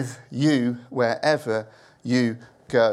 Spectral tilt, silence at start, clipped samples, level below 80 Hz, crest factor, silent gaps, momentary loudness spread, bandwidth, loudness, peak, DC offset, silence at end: -6 dB/octave; 0 s; under 0.1%; -68 dBFS; 18 dB; none; 10 LU; 12.5 kHz; -24 LUFS; -6 dBFS; under 0.1%; 0 s